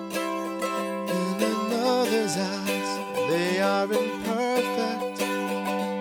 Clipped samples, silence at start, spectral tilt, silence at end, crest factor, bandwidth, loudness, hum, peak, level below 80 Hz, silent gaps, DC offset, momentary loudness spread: under 0.1%; 0 s; -4.5 dB/octave; 0 s; 14 dB; over 20 kHz; -26 LUFS; none; -12 dBFS; -68 dBFS; none; under 0.1%; 5 LU